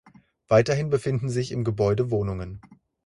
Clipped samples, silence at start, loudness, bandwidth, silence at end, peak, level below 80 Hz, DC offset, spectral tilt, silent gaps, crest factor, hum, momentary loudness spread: under 0.1%; 0.5 s; -24 LUFS; 11.5 kHz; 0.3 s; -6 dBFS; -48 dBFS; under 0.1%; -7 dB/octave; none; 20 dB; none; 13 LU